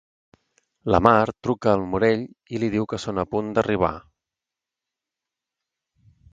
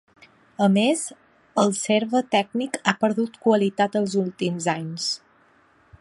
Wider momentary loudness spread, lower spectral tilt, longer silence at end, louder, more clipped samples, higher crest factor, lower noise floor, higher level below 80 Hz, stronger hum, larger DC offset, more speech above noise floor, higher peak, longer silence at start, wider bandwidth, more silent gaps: first, 10 LU vs 7 LU; first, -7 dB/octave vs -4.5 dB/octave; first, 2.35 s vs 0.85 s; about the same, -22 LUFS vs -23 LUFS; neither; about the same, 24 dB vs 22 dB; first, -88 dBFS vs -58 dBFS; first, -46 dBFS vs -68 dBFS; neither; neither; first, 66 dB vs 36 dB; about the same, 0 dBFS vs -2 dBFS; first, 0.85 s vs 0.6 s; second, 9 kHz vs 11.5 kHz; neither